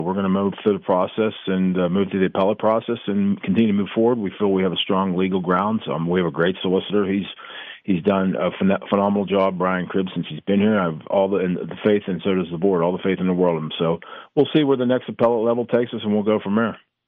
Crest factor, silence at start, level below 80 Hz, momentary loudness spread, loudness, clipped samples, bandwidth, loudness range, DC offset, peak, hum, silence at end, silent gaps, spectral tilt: 14 dB; 0 s; -62 dBFS; 5 LU; -21 LUFS; under 0.1%; 3.9 kHz; 1 LU; under 0.1%; -6 dBFS; none; 0.3 s; none; -10 dB/octave